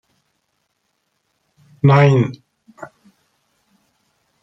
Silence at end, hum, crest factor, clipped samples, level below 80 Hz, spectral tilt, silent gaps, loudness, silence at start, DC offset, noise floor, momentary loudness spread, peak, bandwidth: 1.55 s; none; 20 dB; under 0.1%; -58 dBFS; -8.5 dB/octave; none; -14 LUFS; 1.85 s; under 0.1%; -70 dBFS; 27 LU; -2 dBFS; 6 kHz